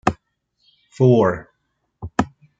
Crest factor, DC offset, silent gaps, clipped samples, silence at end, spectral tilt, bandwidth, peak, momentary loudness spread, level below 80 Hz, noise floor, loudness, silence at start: 20 dB; under 0.1%; none; under 0.1%; 0.35 s; -8 dB/octave; 8 kHz; -2 dBFS; 22 LU; -48 dBFS; -72 dBFS; -19 LUFS; 0.05 s